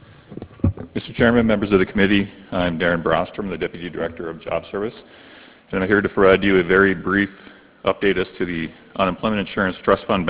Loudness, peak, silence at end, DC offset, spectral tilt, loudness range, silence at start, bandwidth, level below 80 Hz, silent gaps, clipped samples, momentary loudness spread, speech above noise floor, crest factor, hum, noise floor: -20 LUFS; 0 dBFS; 0 s; under 0.1%; -10 dB/octave; 6 LU; 0.3 s; 4 kHz; -40 dBFS; none; under 0.1%; 12 LU; 19 dB; 20 dB; none; -38 dBFS